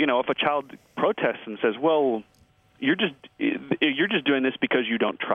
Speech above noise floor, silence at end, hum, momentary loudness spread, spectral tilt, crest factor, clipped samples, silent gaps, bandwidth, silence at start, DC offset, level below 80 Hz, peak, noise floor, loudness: 35 dB; 0 s; none; 6 LU; -7 dB/octave; 18 dB; under 0.1%; none; 4.8 kHz; 0 s; under 0.1%; -70 dBFS; -6 dBFS; -59 dBFS; -25 LUFS